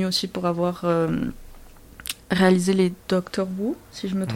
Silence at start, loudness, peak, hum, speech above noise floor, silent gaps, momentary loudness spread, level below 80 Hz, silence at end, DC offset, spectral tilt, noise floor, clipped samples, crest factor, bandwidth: 0 s; -24 LUFS; -4 dBFS; none; 22 dB; none; 13 LU; -48 dBFS; 0 s; under 0.1%; -5.5 dB/octave; -44 dBFS; under 0.1%; 20 dB; 16.5 kHz